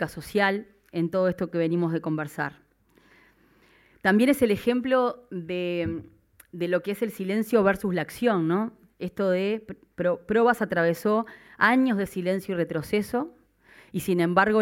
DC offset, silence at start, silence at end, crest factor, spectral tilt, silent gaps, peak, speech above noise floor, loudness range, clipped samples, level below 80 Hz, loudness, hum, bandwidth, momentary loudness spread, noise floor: under 0.1%; 0 s; 0 s; 20 dB; -6.5 dB/octave; none; -6 dBFS; 36 dB; 3 LU; under 0.1%; -60 dBFS; -25 LUFS; none; 17 kHz; 12 LU; -61 dBFS